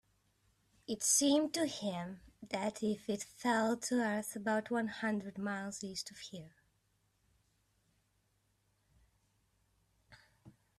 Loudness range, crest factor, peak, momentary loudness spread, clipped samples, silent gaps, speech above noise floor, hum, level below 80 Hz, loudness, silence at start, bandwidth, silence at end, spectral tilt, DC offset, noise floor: 13 LU; 20 dB; -18 dBFS; 16 LU; under 0.1%; none; 41 dB; none; -76 dBFS; -36 LUFS; 0.9 s; 14 kHz; 0.3 s; -3 dB/octave; under 0.1%; -78 dBFS